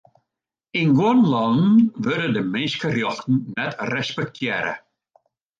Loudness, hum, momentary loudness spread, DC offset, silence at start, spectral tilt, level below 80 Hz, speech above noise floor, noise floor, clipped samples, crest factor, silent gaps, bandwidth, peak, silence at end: -21 LUFS; none; 10 LU; under 0.1%; 0.75 s; -6.5 dB/octave; -64 dBFS; 65 dB; -85 dBFS; under 0.1%; 14 dB; none; 7.6 kHz; -6 dBFS; 0.8 s